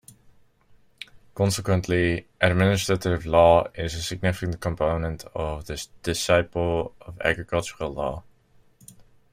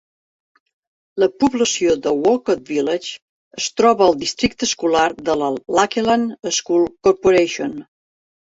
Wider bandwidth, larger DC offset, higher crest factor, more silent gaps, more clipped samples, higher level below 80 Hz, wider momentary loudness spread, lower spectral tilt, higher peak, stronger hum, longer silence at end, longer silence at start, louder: first, 16 kHz vs 8 kHz; neither; about the same, 20 dB vs 18 dB; second, none vs 3.22-3.51 s; neither; first, -44 dBFS vs -52 dBFS; first, 13 LU vs 10 LU; first, -5 dB/octave vs -3.5 dB/octave; about the same, -4 dBFS vs -2 dBFS; neither; second, 0.3 s vs 0.65 s; about the same, 1.15 s vs 1.15 s; second, -24 LUFS vs -18 LUFS